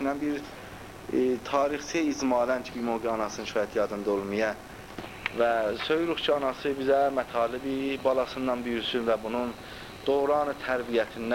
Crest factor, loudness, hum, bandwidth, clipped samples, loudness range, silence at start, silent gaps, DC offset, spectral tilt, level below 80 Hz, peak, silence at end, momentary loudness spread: 18 dB; -28 LUFS; none; 16 kHz; under 0.1%; 2 LU; 0 s; none; under 0.1%; -4.5 dB/octave; -56 dBFS; -10 dBFS; 0 s; 10 LU